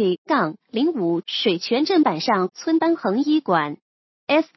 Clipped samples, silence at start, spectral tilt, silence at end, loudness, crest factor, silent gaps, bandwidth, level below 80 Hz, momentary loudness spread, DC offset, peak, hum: under 0.1%; 0 s; -5.5 dB/octave; 0.1 s; -21 LUFS; 16 dB; 0.18-0.25 s, 3.82-4.27 s; 6 kHz; -76 dBFS; 5 LU; under 0.1%; -4 dBFS; none